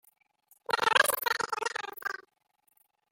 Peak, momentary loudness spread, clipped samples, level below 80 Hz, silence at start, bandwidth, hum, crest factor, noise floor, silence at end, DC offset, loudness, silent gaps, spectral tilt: -6 dBFS; 15 LU; under 0.1%; -76 dBFS; 0.7 s; 17 kHz; none; 26 dB; -74 dBFS; 1 s; under 0.1%; -29 LUFS; none; 0.5 dB/octave